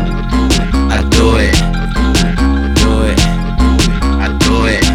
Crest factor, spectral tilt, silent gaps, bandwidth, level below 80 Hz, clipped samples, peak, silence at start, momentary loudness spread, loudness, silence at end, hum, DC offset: 10 dB; -5 dB/octave; none; 15 kHz; -14 dBFS; under 0.1%; 0 dBFS; 0 s; 4 LU; -12 LUFS; 0 s; none; under 0.1%